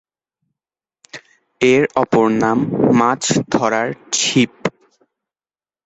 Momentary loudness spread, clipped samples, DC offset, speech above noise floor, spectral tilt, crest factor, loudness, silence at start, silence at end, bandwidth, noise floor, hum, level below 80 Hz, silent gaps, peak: 15 LU; under 0.1%; under 0.1%; over 75 dB; -4 dB/octave; 18 dB; -16 LUFS; 1.15 s; 1.15 s; 8.2 kHz; under -90 dBFS; none; -54 dBFS; none; 0 dBFS